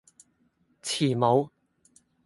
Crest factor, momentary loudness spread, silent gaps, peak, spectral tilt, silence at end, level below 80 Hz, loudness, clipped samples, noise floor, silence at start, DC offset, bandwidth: 22 dB; 15 LU; none; -8 dBFS; -5.5 dB/octave; 0.8 s; -70 dBFS; -26 LUFS; under 0.1%; -69 dBFS; 0.85 s; under 0.1%; 11.5 kHz